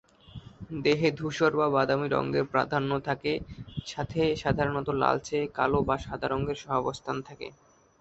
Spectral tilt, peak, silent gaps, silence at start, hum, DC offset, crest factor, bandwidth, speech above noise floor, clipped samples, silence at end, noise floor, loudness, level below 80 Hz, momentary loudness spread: -6 dB/octave; -8 dBFS; none; 0.35 s; none; under 0.1%; 20 dB; 8.2 kHz; 20 dB; under 0.1%; 0.5 s; -48 dBFS; -28 LUFS; -50 dBFS; 15 LU